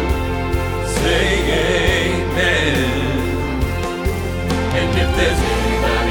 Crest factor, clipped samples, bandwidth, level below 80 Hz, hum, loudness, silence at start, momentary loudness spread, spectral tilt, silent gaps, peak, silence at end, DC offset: 16 dB; under 0.1%; 19.5 kHz; -24 dBFS; none; -18 LUFS; 0 s; 6 LU; -5 dB/octave; none; -2 dBFS; 0 s; under 0.1%